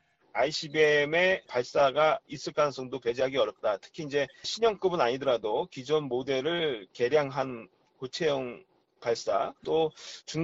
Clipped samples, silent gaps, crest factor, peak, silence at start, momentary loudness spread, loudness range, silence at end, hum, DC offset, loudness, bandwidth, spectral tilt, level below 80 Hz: under 0.1%; none; 16 dB; -12 dBFS; 0.35 s; 12 LU; 4 LU; 0 s; none; under 0.1%; -29 LUFS; 8 kHz; -4.5 dB/octave; -66 dBFS